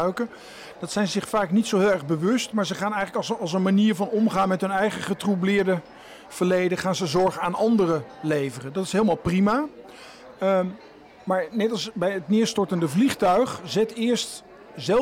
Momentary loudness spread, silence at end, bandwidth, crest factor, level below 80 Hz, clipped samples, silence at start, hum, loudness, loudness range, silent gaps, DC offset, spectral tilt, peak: 13 LU; 0 s; 16 kHz; 12 dB; -58 dBFS; under 0.1%; 0 s; none; -24 LUFS; 2 LU; none; under 0.1%; -5.5 dB/octave; -12 dBFS